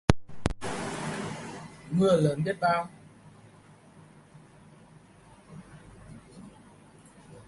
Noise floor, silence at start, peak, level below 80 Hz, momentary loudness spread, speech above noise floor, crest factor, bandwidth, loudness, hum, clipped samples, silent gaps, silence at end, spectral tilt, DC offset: -55 dBFS; 0.1 s; 0 dBFS; -48 dBFS; 26 LU; 30 dB; 30 dB; 11.5 kHz; -29 LUFS; none; under 0.1%; none; 0.05 s; -6 dB/octave; under 0.1%